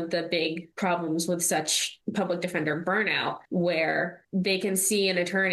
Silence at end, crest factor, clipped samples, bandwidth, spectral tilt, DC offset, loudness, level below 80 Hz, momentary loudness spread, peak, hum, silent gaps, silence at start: 0 s; 16 dB; under 0.1%; 13 kHz; -3 dB/octave; under 0.1%; -26 LUFS; -72 dBFS; 6 LU; -12 dBFS; none; none; 0 s